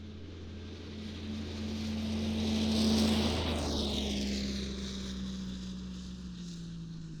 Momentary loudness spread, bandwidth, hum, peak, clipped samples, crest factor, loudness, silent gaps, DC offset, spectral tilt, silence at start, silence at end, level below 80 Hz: 15 LU; 18.5 kHz; none; -16 dBFS; under 0.1%; 18 dB; -35 LUFS; none; under 0.1%; -5 dB/octave; 0 s; 0 s; -46 dBFS